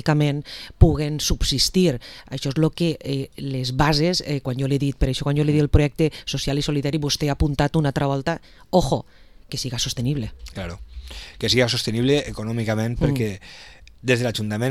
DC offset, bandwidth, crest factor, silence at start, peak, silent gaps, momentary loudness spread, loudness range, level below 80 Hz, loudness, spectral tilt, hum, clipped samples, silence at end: 0.2%; 15 kHz; 22 dB; 0.05 s; 0 dBFS; none; 14 LU; 3 LU; -32 dBFS; -22 LUFS; -5.5 dB/octave; none; under 0.1%; 0 s